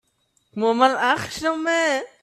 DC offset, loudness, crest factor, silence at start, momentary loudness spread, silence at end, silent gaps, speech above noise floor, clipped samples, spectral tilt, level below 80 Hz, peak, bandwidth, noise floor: under 0.1%; -21 LUFS; 20 dB; 0.55 s; 7 LU; 0.15 s; none; 47 dB; under 0.1%; -3 dB/octave; -62 dBFS; -2 dBFS; 14.5 kHz; -67 dBFS